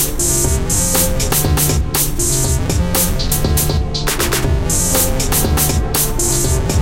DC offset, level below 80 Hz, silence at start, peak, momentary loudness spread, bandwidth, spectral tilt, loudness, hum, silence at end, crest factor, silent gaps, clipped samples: under 0.1%; -20 dBFS; 0 s; -2 dBFS; 3 LU; 17 kHz; -3.5 dB/octave; -15 LUFS; none; 0 s; 14 dB; none; under 0.1%